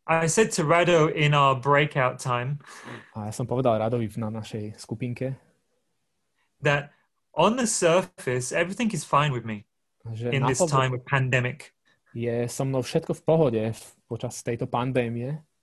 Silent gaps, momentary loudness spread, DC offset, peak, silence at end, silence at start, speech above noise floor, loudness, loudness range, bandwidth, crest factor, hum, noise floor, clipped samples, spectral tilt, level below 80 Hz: none; 15 LU; under 0.1%; -6 dBFS; 0.2 s; 0.05 s; 53 dB; -25 LUFS; 7 LU; 12.5 kHz; 18 dB; none; -78 dBFS; under 0.1%; -5 dB/octave; -58 dBFS